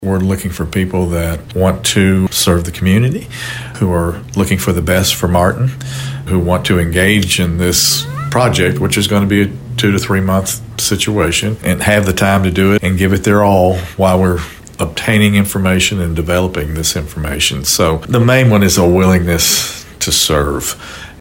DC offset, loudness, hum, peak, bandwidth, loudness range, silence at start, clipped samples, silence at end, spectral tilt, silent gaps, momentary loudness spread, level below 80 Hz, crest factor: under 0.1%; -13 LUFS; none; 0 dBFS; 16.5 kHz; 3 LU; 0 s; under 0.1%; 0.05 s; -4.5 dB/octave; none; 8 LU; -30 dBFS; 12 dB